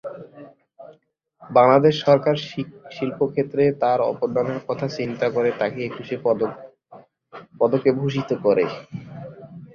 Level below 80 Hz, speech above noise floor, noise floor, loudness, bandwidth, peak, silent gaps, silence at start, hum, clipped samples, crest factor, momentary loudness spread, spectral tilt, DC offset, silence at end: -62 dBFS; 40 dB; -60 dBFS; -21 LUFS; 7 kHz; -2 dBFS; none; 0.05 s; none; under 0.1%; 20 dB; 19 LU; -7.5 dB/octave; under 0.1%; 0.1 s